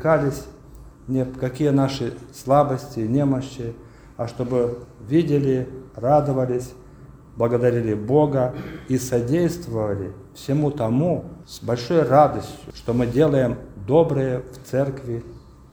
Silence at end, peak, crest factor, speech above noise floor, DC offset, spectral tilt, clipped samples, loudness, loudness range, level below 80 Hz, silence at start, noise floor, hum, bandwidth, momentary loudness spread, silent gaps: 0.35 s; -2 dBFS; 20 dB; 23 dB; under 0.1%; -7.5 dB/octave; under 0.1%; -22 LUFS; 3 LU; -46 dBFS; 0 s; -44 dBFS; none; over 20 kHz; 15 LU; none